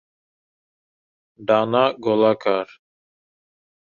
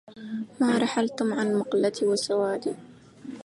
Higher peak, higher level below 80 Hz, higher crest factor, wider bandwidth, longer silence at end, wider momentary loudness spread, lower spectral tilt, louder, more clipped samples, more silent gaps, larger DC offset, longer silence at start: first, -2 dBFS vs -12 dBFS; about the same, -68 dBFS vs -72 dBFS; first, 20 dB vs 14 dB; second, 7 kHz vs 11.5 kHz; first, 1.3 s vs 0 s; about the same, 11 LU vs 13 LU; first, -7 dB/octave vs -4.5 dB/octave; first, -19 LUFS vs -26 LUFS; neither; neither; neither; first, 1.4 s vs 0.1 s